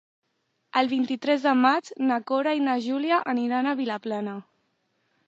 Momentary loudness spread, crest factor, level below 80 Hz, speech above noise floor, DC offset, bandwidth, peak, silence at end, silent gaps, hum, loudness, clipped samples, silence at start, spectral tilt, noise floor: 9 LU; 18 dB; -82 dBFS; 50 dB; under 0.1%; 7.8 kHz; -6 dBFS; 0.85 s; none; none; -25 LUFS; under 0.1%; 0.75 s; -5 dB/octave; -75 dBFS